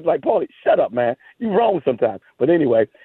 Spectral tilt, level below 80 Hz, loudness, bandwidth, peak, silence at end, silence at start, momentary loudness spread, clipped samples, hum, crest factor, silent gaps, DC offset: -10 dB/octave; -62 dBFS; -19 LUFS; 4.1 kHz; -4 dBFS; 0.2 s; 0 s; 6 LU; under 0.1%; none; 14 dB; none; under 0.1%